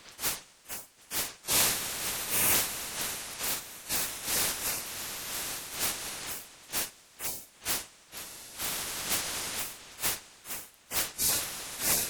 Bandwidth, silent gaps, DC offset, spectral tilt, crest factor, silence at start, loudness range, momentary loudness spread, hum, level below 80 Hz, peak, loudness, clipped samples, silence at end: over 20 kHz; none; under 0.1%; 0 dB/octave; 22 dB; 0 s; 6 LU; 14 LU; none; -58 dBFS; -12 dBFS; -31 LUFS; under 0.1%; 0 s